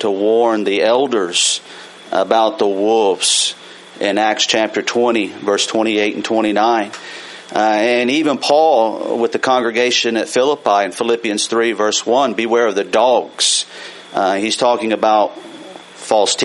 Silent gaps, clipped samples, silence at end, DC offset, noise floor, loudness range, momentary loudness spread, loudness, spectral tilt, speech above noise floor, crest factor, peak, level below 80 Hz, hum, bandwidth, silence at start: none; under 0.1%; 0 s; under 0.1%; -35 dBFS; 2 LU; 10 LU; -15 LUFS; -2 dB/octave; 20 dB; 16 dB; 0 dBFS; -66 dBFS; none; 11.5 kHz; 0 s